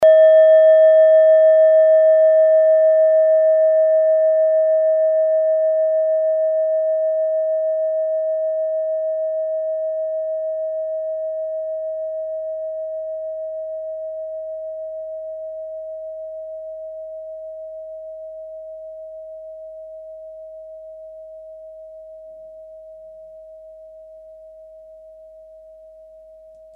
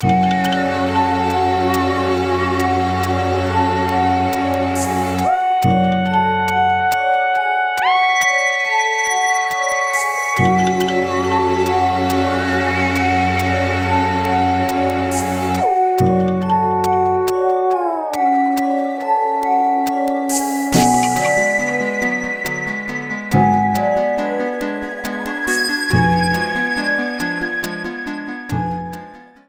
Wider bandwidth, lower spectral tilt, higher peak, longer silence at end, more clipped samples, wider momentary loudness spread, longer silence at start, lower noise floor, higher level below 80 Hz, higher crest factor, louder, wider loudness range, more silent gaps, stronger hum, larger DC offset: second, 3.5 kHz vs 19.5 kHz; about the same, -4 dB/octave vs -5 dB/octave; about the same, -4 dBFS vs -2 dBFS; first, 1.8 s vs 0.25 s; neither; first, 25 LU vs 6 LU; about the same, 0 s vs 0 s; first, -44 dBFS vs -38 dBFS; second, -64 dBFS vs -44 dBFS; about the same, 14 dB vs 16 dB; about the same, -16 LUFS vs -17 LUFS; first, 24 LU vs 3 LU; neither; neither; neither